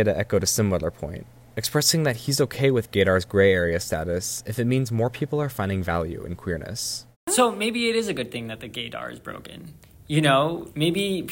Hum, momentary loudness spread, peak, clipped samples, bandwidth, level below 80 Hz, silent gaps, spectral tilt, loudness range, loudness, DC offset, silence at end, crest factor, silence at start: none; 14 LU; -6 dBFS; under 0.1%; 16.5 kHz; -50 dBFS; 7.16-7.27 s; -4.5 dB/octave; 4 LU; -24 LUFS; under 0.1%; 0 s; 20 dB; 0 s